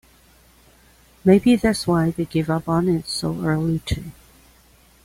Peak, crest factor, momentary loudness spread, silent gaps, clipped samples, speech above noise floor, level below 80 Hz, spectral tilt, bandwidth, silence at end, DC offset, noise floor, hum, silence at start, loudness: -4 dBFS; 18 dB; 10 LU; none; under 0.1%; 34 dB; -42 dBFS; -6.5 dB/octave; 16 kHz; 0.95 s; under 0.1%; -53 dBFS; none; 1.25 s; -20 LUFS